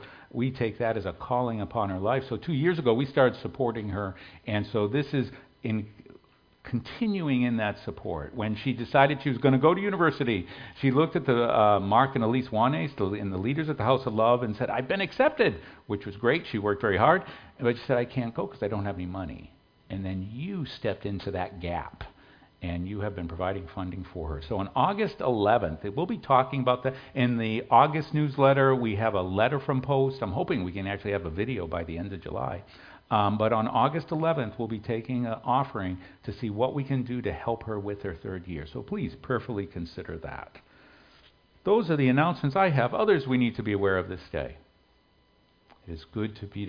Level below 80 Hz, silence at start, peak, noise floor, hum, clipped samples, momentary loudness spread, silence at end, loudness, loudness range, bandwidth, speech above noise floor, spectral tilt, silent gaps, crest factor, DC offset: -52 dBFS; 0 s; -4 dBFS; -64 dBFS; none; under 0.1%; 13 LU; 0 s; -28 LUFS; 9 LU; 5.2 kHz; 37 dB; -9 dB/octave; none; 22 dB; under 0.1%